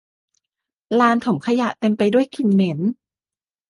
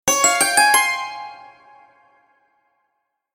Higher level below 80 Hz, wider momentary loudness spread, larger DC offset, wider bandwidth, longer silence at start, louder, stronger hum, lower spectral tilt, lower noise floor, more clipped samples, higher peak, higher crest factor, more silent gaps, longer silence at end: second, -66 dBFS vs -60 dBFS; second, 7 LU vs 20 LU; neither; second, 11.5 kHz vs 17 kHz; first, 0.9 s vs 0.05 s; second, -19 LUFS vs -15 LUFS; neither; first, -7 dB/octave vs 0.5 dB/octave; first, under -90 dBFS vs -74 dBFS; neither; about the same, -4 dBFS vs -2 dBFS; about the same, 16 dB vs 20 dB; neither; second, 0.75 s vs 1.9 s